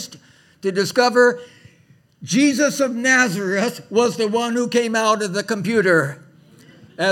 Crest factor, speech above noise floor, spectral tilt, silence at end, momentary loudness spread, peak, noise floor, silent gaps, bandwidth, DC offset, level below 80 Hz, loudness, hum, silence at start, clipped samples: 18 dB; 36 dB; -4 dB/octave; 0 s; 8 LU; -2 dBFS; -54 dBFS; none; 17 kHz; under 0.1%; -70 dBFS; -18 LUFS; none; 0 s; under 0.1%